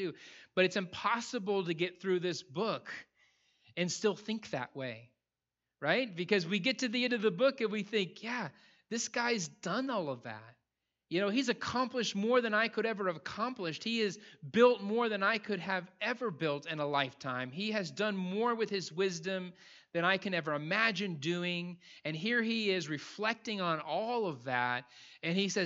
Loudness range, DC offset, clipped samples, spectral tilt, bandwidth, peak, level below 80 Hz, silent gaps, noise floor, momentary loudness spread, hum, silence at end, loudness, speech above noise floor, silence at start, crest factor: 4 LU; under 0.1%; under 0.1%; -4.5 dB/octave; 8.2 kHz; -12 dBFS; -80 dBFS; none; under -90 dBFS; 10 LU; none; 0 s; -34 LUFS; over 56 dB; 0 s; 22 dB